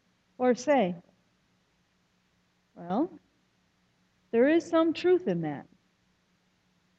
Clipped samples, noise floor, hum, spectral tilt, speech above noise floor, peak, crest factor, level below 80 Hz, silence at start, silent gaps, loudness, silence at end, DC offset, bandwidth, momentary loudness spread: under 0.1%; -71 dBFS; none; -6 dB/octave; 45 dB; -12 dBFS; 18 dB; -76 dBFS; 0.4 s; none; -27 LUFS; 1.35 s; under 0.1%; 8 kHz; 13 LU